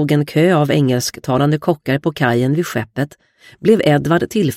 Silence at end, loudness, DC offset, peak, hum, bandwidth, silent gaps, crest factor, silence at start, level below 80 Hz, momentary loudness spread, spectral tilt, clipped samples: 0 s; -16 LUFS; under 0.1%; 0 dBFS; none; 16.5 kHz; none; 16 dB; 0 s; -52 dBFS; 8 LU; -6 dB/octave; under 0.1%